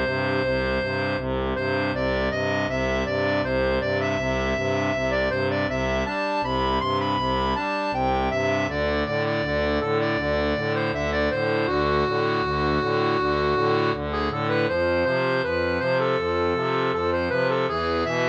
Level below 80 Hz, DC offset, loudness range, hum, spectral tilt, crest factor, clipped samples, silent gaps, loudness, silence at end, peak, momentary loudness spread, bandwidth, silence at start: -40 dBFS; under 0.1%; 1 LU; none; -6 dB/octave; 14 dB; under 0.1%; none; -24 LUFS; 0 s; -10 dBFS; 2 LU; 8.4 kHz; 0 s